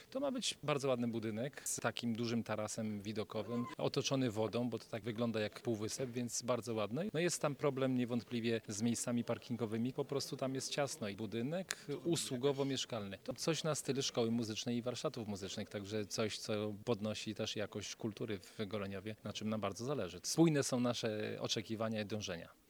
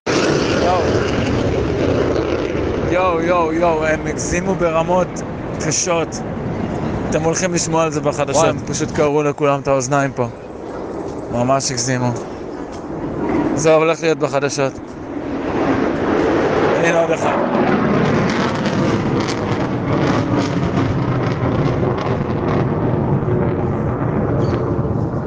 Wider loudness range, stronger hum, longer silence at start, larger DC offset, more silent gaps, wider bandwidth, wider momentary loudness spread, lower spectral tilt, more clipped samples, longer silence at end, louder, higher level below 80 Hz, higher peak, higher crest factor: about the same, 3 LU vs 3 LU; neither; about the same, 0 s vs 0.05 s; neither; neither; first, over 20 kHz vs 10 kHz; about the same, 7 LU vs 8 LU; about the same, -4.5 dB/octave vs -5.5 dB/octave; neither; first, 0.15 s vs 0 s; second, -39 LUFS vs -18 LUFS; second, -76 dBFS vs -36 dBFS; second, -12 dBFS vs -2 dBFS; first, 28 dB vs 14 dB